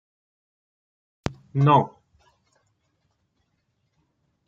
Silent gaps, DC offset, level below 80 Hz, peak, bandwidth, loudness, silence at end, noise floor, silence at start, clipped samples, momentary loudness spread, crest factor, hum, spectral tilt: none; under 0.1%; -58 dBFS; -6 dBFS; 7.4 kHz; -23 LUFS; 2.6 s; -73 dBFS; 1.25 s; under 0.1%; 16 LU; 24 dB; none; -8 dB/octave